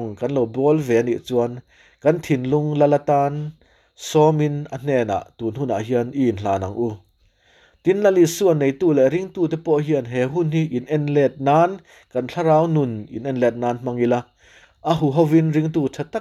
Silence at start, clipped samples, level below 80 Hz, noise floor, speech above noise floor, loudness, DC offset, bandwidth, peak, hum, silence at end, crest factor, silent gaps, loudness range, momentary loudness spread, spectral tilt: 0 s; under 0.1%; -58 dBFS; -59 dBFS; 40 dB; -20 LUFS; under 0.1%; 14.5 kHz; -4 dBFS; none; 0 s; 16 dB; none; 3 LU; 10 LU; -7 dB/octave